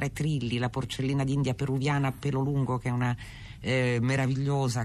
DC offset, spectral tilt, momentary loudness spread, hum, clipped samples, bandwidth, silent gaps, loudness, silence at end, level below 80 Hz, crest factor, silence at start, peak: under 0.1%; -6.5 dB/octave; 5 LU; none; under 0.1%; 13 kHz; none; -29 LUFS; 0 s; -50 dBFS; 12 dB; 0 s; -16 dBFS